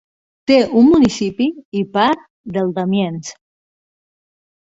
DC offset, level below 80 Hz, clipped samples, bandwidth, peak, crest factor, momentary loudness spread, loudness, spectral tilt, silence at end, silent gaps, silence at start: under 0.1%; -50 dBFS; under 0.1%; 8 kHz; -2 dBFS; 16 dB; 14 LU; -16 LUFS; -6 dB/octave; 1.35 s; 1.65-1.72 s, 2.30-2.44 s; 0.5 s